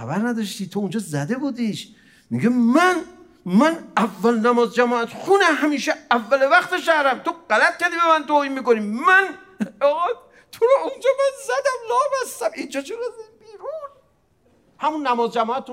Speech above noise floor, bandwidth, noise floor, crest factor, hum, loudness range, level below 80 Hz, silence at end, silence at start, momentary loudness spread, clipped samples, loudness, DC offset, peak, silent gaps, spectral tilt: 41 dB; 16 kHz; -61 dBFS; 18 dB; none; 8 LU; -70 dBFS; 0 s; 0 s; 13 LU; under 0.1%; -20 LUFS; under 0.1%; -2 dBFS; none; -4.5 dB/octave